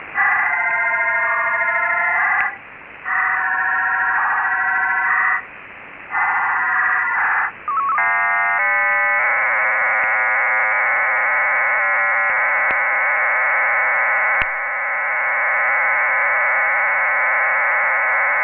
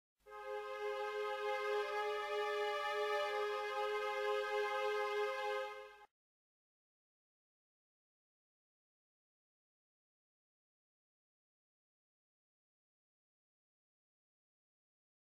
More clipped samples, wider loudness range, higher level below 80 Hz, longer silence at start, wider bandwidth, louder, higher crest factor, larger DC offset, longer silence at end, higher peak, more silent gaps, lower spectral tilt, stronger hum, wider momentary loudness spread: neither; second, 3 LU vs 7 LU; first, -58 dBFS vs -84 dBFS; second, 0 s vs 0.25 s; second, 4 kHz vs 16 kHz; first, -16 LUFS vs -40 LUFS; about the same, 16 dB vs 16 dB; neither; second, 0 s vs 9.3 s; first, -2 dBFS vs -28 dBFS; neither; second, 0.5 dB/octave vs -1 dB/octave; neither; second, 4 LU vs 9 LU